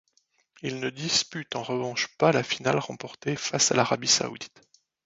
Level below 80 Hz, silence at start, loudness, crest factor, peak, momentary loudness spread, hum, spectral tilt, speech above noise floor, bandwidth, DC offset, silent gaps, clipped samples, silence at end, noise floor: -66 dBFS; 0.65 s; -26 LUFS; 22 dB; -6 dBFS; 13 LU; none; -2.5 dB/octave; 42 dB; 8.2 kHz; under 0.1%; none; under 0.1%; 0.6 s; -69 dBFS